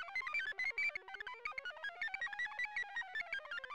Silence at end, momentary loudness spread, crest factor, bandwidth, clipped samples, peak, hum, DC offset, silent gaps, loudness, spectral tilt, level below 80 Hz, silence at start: 0 s; 8 LU; 12 dB; 16 kHz; under 0.1%; -32 dBFS; none; under 0.1%; none; -41 LUFS; 0 dB/octave; -74 dBFS; 0 s